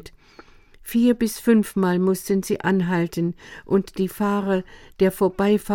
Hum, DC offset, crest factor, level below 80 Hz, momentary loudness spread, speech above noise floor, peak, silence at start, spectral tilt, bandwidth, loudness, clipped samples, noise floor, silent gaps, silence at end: none; under 0.1%; 16 dB; -50 dBFS; 8 LU; 28 dB; -4 dBFS; 0.05 s; -6.5 dB/octave; 17.5 kHz; -22 LUFS; under 0.1%; -49 dBFS; none; 0 s